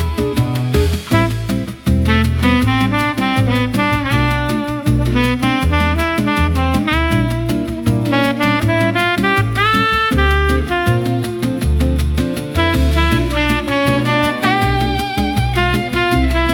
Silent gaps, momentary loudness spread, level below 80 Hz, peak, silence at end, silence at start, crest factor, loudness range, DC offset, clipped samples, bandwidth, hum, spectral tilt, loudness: none; 4 LU; -24 dBFS; -2 dBFS; 0 s; 0 s; 14 dB; 1 LU; under 0.1%; under 0.1%; 18 kHz; none; -6 dB/octave; -15 LUFS